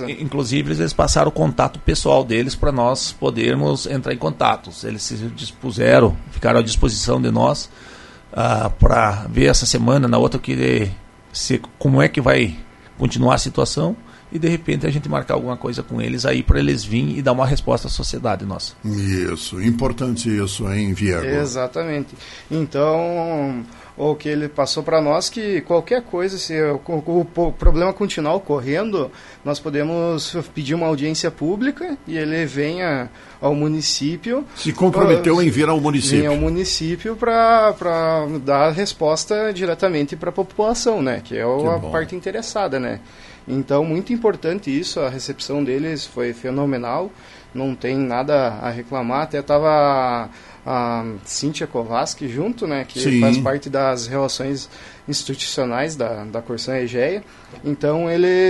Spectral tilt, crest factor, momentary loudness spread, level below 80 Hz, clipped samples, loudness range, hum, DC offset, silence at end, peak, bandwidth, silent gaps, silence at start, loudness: -5 dB/octave; 18 dB; 10 LU; -32 dBFS; under 0.1%; 5 LU; none; under 0.1%; 0 s; 0 dBFS; 11.5 kHz; none; 0 s; -19 LUFS